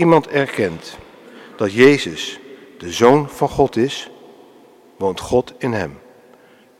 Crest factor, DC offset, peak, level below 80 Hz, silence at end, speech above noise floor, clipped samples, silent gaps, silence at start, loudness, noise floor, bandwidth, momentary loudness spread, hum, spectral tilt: 18 dB; under 0.1%; 0 dBFS; -48 dBFS; 0.8 s; 32 dB; under 0.1%; none; 0 s; -17 LUFS; -48 dBFS; 15 kHz; 21 LU; none; -5.5 dB/octave